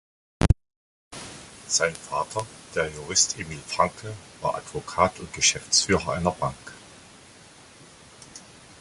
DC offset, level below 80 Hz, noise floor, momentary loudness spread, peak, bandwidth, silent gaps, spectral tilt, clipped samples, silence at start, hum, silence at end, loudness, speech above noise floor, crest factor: under 0.1%; -40 dBFS; -50 dBFS; 21 LU; -4 dBFS; 11.5 kHz; 0.76-1.11 s; -2.5 dB/octave; under 0.1%; 0.4 s; none; 0.05 s; -25 LUFS; 24 dB; 24 dB